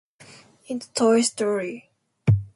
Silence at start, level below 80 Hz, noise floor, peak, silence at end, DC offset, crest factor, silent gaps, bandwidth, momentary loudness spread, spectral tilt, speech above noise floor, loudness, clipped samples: 0.7 s; -46 dBFS; -50 dBFS; -6 dBFS; 0.1 s; under 0.1%; 18 dB; none; 11.5 kHz; 15 LU; -5.5 dB/octave; 27 dB; -23 LUFS; under 0.1%